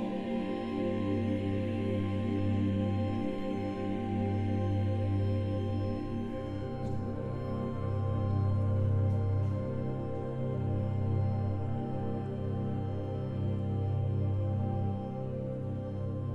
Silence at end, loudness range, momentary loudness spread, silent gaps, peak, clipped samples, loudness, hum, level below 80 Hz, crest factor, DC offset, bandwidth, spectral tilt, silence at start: 0 s; 2 LU; 6 LU; none; -20 dBFS; under 0.1%; -33 LUFS; none; -50 dBFS; 12 dB; under 0.1%; 5.6 kHz; -10 dB/octave; 0 s